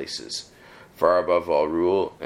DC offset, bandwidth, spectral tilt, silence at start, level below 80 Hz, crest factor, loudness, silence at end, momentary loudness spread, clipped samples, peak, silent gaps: under 0.1%; 15.5 kHz; -4.5 dB/octave; 0 s; -58 dBFS; 18 dB; -23 LUFS; 0 s; 11 LU; under 0.1%; -6 dBFS; none